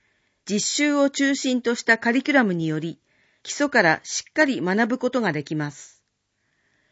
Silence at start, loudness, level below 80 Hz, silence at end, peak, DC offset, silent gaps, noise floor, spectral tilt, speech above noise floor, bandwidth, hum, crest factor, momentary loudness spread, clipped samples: 0.45 s; -22 LUFS; -72 dBFS; 1.05 s; -4 dBFS; under 0.1%; none; -73 dBFS; -4 dB/octave; 51 dB; 8 kHz; none; 20 dB; 11 LU; under 0.1%